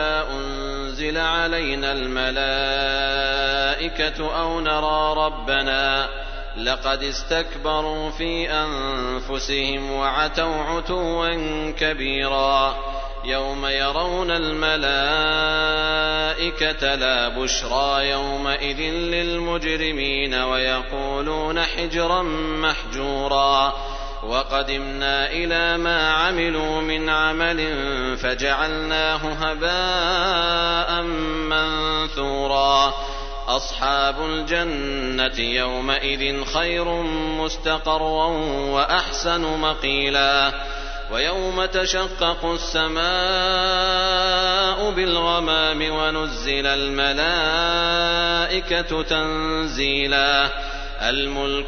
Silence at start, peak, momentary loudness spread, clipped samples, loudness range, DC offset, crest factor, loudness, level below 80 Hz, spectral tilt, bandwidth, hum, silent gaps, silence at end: 0 s; -4 dBFS; 6 LU; under 0.1%; 3 LU; under 0.1%; 18 dB; -21 LUFS; -32 dBFS; -3 dB/octave; 6.6 kHz; none; none; 0 s